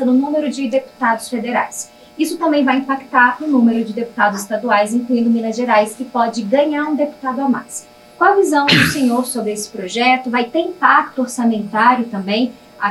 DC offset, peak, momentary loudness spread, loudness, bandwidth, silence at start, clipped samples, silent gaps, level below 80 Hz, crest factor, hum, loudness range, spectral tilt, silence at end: under 0.1%; 0 dBFS; 9 LU; -16 LUFS; 13 kHz; 0 s; under 0.1%; none; -56 dBFS; 16 dB; none; 2 LU; -4 dB/octave; 0 s